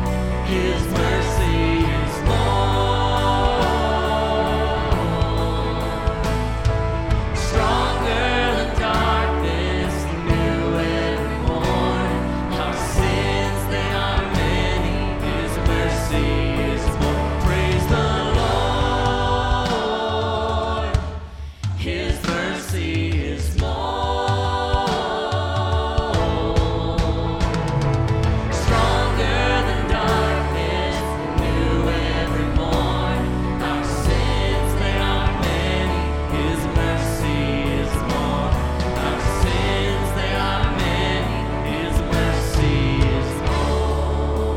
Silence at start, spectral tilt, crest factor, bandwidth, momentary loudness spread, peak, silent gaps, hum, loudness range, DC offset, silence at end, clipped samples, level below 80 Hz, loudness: 0 s; -6 dB/octave; 14 dB; 16.5 kHz; 4 LU; -4 dBFS; none; none; 2 LU; under 0.1%; 0 s; under 0.1%; -26 dBFS; -21 LUFS